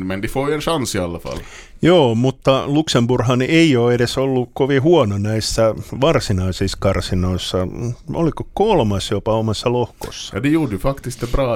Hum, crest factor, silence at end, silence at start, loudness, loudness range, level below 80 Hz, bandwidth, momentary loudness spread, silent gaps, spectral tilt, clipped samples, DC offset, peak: none; 16 dB; 0 s; 0 s; -18 LUFS; 4 LU; -34 dBFS; 16.5 kHz; 11 LU; none; -6 dB/octave; under 0.1%; under 0.1%; -2 dBFS